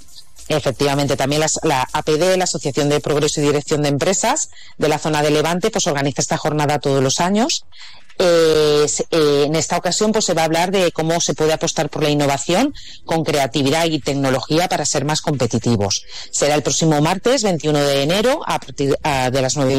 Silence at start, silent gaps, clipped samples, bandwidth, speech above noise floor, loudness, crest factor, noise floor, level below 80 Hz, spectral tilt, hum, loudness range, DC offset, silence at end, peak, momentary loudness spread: 0.15 s; none; under 0.1%; 16 kHz; 25 dB; -17 LUFS; 12 dB; -42 dBFS; -46 dBFS; -4 dB/octave; none; 2 LU; 2%; 0 s; -6 dBFS; 4 LU